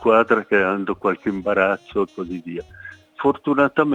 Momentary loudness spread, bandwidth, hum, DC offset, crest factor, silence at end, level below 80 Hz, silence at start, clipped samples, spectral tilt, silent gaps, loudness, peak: 16 LU; 8.6 kHz; none; under 0.1%; 18 dB; 0 s; -56 dBFS; 0 s; under 0.1%; -7.5 dB/octave; none; -20 LUFS; -2 dBFS